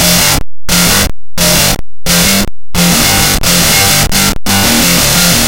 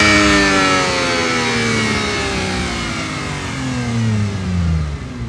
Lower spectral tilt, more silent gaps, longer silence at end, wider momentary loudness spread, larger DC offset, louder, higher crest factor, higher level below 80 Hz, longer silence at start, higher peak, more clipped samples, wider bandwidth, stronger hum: second, -2.5 dB/octave vs -4 dB/octave; neither; about the same, 0 s vs 0 s; second, 6 LU vs 10 LU; neither; first, -8 LUFS vs -16 LUFS; second, 8 dB vs 16 dB; first, -22 dBFS vs -32 dBFS; about the same, 0 s vs 0 s; about the same, 0 dBFS vs 0 dBFS; first, 0.2% vs under 0.1%; first, over 20 kHz vs 12 kHz; neither